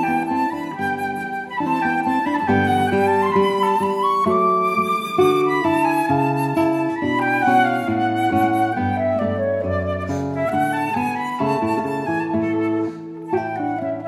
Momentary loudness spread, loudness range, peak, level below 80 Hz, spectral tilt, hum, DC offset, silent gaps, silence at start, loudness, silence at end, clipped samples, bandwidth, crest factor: 7 LU; 4 LU; -4 dBFS; -56 dBFS; -6.5 dB/octave; none; under 0.1%; none; 0 s; -20 LUFS; 0 s; under 0.1%; 15 kHz; 14 dB